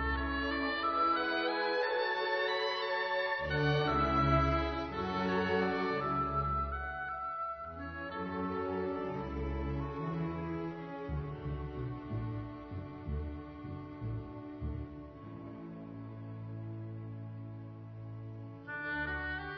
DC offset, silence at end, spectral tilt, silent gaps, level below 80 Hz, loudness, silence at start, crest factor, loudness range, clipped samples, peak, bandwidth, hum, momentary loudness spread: under 0.1%; 0 s; -4 dB/octave; none; -46 dBFS; -35 LUFS; 0 s; 18 dB; 13 LU; under 0.1%; -16 dBFS; 6.2 kHz; none; 16 LU